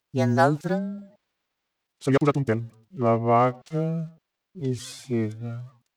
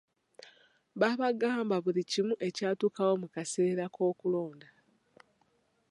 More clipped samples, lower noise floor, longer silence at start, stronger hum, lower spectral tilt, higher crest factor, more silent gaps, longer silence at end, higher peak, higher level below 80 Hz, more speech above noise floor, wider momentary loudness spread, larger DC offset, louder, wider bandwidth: neither; first, -81 dBFS vs -73 dBFS; second, 0.15 s vs 0.95 s; neither; first, -7.5 dB/octave vs -5 dB/octave; about the same, 18 dB vs 20 dB; neither; second, 0.25 s vs 1.3 s; first, -8 dBFS vs -14 dBFS; first, -66 dBFS vs -84 dBFS; first, 57 dB vs 42 dB; first, 15 LU vs 5 LU; neither; first, -25 LUFS vs -31 LUFS; first, 13 kHz vs 11.5 kHz